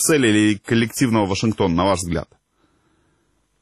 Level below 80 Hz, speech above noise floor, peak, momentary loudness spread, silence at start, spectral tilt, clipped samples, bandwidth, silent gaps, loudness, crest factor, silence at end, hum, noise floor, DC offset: -44 dBFS; 47 dB; -6 dBFS; 7 LU; 0 s; -4.5 dB/octave; under 0.1%; 13 kHz; none; -19 LUFS; 14 dB; 1.35 s; none; -65 dBFS; under 0.1%